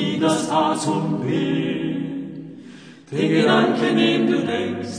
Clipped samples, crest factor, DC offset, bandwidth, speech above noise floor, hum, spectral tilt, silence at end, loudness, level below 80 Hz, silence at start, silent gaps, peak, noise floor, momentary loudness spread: under 0.1%; 16 dB; under 0.1%; 10 kHz; 23 dB; none; -5.5 dB/octave; 0 s; -20 LUFS; -66 dBFS; 0 s; none; -4 dBFS; -42 dBFS; 14 LU